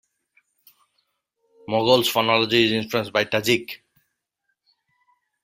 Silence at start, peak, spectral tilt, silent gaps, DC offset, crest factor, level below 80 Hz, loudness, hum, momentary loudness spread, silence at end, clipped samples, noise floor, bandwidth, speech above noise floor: 1.7 s; -2 dBFS; -4 dB/octave; none; under 0.1%; 22 dB; -62 dBFS; -20 LUFS; none; 8 LU; 1.7 s; under 0.1%; -77 dBFS; 16 kHz; 56 dB